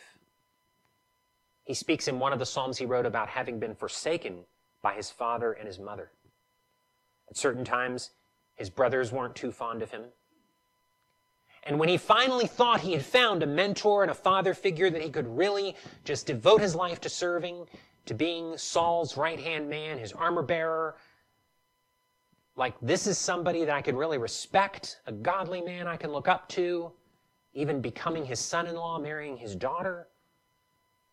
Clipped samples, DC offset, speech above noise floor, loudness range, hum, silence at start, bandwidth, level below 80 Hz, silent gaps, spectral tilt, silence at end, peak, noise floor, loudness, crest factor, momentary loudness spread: under 0.1%; under 0.1%; 45 dB; 9 LU; none; 1.65 s; 13.5 kHz; -68 dBFS; none; -4 dB/octave; 1.1 s; -8 dBFS; -74 dBFS; -29 LUFS; 22 dB; 15 LU